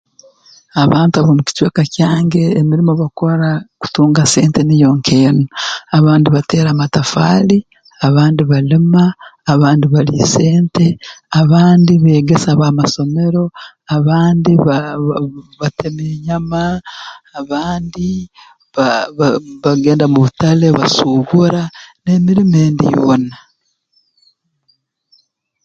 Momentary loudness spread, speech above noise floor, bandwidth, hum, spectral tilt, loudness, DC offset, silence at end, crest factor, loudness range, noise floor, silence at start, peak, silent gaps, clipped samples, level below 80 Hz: 10 LU; 50 dB; 9.2 kHz; none; -6.5 dB/octave; -12 LUFS; under 0.1%; 2.3 s; 12 dB; 7 LU; -62 dBFS; 0.75 s; 0 dBFS; none; under 0.1%; -44 dBFS